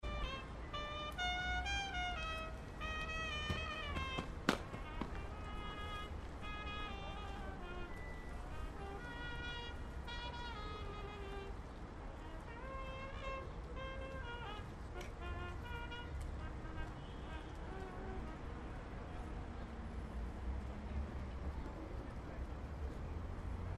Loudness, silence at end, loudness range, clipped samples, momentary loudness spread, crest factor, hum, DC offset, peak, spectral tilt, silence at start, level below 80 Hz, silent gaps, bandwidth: -46 LUFS; 0 s; 7 LU; under 0.1%; 9 LU; 28 dB; none; under 0.1%; -16 dBFS; -5 dB/octave; 0 s; -48 dBFS; none; 13 kHz